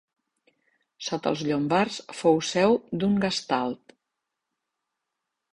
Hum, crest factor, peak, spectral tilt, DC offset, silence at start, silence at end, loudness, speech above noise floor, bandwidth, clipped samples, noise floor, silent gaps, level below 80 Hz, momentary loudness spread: none; 20 dB; -8 dBFS; -5 dB/octave; under 0.1%; 1 s; 1.8 s; -25 LUFS; 59 dB; 11 kHz; under 0.1%; -84 dBFS; none; -62 dBFS; 10 LU